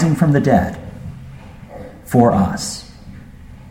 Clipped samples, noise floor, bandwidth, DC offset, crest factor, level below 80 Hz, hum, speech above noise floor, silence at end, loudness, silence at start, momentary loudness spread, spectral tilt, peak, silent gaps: under 0.1%; -37 dBFS; 16 kHz; under 0.1%; 18 dB; -38 dBFS; none; 23 dB; 0 s; -16 LUFS; 0 s; 24 LU; -6.5 dB/octave; 0 dBFS; none